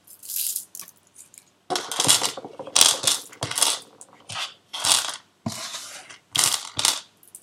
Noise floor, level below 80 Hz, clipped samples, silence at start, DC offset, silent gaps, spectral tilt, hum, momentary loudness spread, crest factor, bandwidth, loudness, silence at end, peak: -51 dBFS; -68 dBFS; under 0.1%; 0.1 s; under 0.1%; none; 0 dB/octave; none; 18 LU; 26 dB; 17 kHz; -22 LUFS; 0.05 s; 0 dBFS